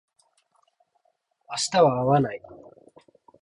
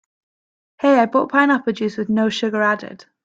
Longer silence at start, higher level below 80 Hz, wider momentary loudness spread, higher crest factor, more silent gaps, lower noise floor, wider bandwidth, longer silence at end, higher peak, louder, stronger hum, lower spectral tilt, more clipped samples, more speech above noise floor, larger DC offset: first, 1.5 s vs 0.8 s; about the same, -62 dBFS vs -66 dBFS; first, 14 LU vs 8 LU; about the same, 20 dB vs 16 dB; neither; second, -71 dBFS vs under -90 dBFS; first, 11.5 kHz vs 7.8 kHz; first, 0.85 s vs 0.3 s; second, -8 dBFS vs -2 dBFS; second, -23 LUFS vs -18 LUFS; neither; about the same, -5 dB/octave vs -5.5 dB/octave; neither; second, 49 dB vs over 72 dB; neither